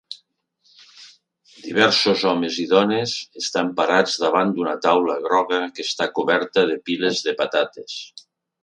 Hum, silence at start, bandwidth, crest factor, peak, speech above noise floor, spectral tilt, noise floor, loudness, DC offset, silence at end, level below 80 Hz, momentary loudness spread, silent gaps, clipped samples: none; 0.1 s; 10.5 kHz; 20 dB; 0 dBFS; 44 dB; -3.5 dB/octave; -64 dBFS; -20 LUFS; under 0.1%; 0.45 s; -68 dBFS; 10 LU; none; under 0.1%